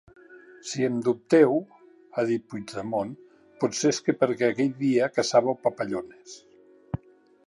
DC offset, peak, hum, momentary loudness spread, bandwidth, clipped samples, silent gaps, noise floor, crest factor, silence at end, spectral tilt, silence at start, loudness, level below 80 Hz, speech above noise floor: under 0.1%; -6 dBFS; none; 15 LU; 11.5 kHz; under 0.1%; none; -52 dBFS; 20 dB; 0.5 s; -5 dB/octave; 0.3 s; -25 LUFS; -60 dBFS; 27 dB